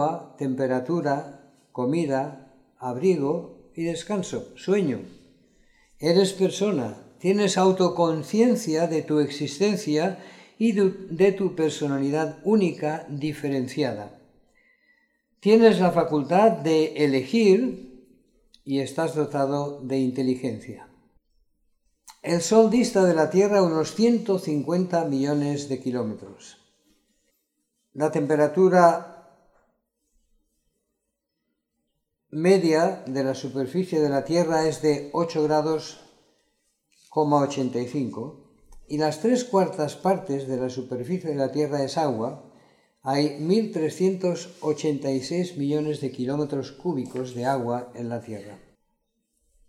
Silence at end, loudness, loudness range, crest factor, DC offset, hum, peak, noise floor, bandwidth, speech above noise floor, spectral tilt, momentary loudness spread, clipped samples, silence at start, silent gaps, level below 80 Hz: 1.1 s; -24 LUFS; 6 LU; 22 dB; under 0.1%; none; -4 dBFS; -80 dBFS; 13.5 kHz; 56 dB; -6 dB/octave; 13 LU; under 0.1%; 0 s; none; -64 dBFS